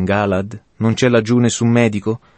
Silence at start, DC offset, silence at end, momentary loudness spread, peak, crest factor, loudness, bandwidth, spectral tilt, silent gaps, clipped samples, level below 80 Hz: 0 s; under 0.1%; 0.2 s; 8 LU; -2 dBFS; 14 dB; -16 LUFS; 8.8 kHz; -6 dB/octave; none; under 0.1%; -50 dBFS